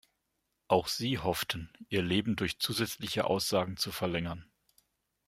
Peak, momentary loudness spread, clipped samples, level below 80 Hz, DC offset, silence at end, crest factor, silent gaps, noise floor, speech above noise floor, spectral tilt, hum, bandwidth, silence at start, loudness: -10 dBFS; 6 LU; under 0.1%; -60 dBFS; under 0.1%; 0.85 s; 24 dB; none; -81 dBFS; 49 dB; -4.5 dB/octave; none; 16 kHz; 0.7 s; -32 LUFS